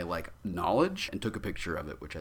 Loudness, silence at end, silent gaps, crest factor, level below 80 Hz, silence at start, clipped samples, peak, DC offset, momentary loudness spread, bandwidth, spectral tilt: -33 LUFS; 0 s; none; 20 dB; -50 dBFS; 0 s; under 0.1%; -14 dBFS; under 0.1%; 10 LU; 19.5 kHz; -5.5 dB/octave